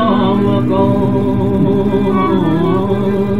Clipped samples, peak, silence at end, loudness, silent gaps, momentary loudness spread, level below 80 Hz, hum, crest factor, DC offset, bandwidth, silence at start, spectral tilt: under 0.1%; 0 dBFS; 0 s; -13 LUFS; none; 2 LU; -36 dBFS; none; 12 dB; 4%; 5.4 kHz; 0 s; -9.5 dB/octave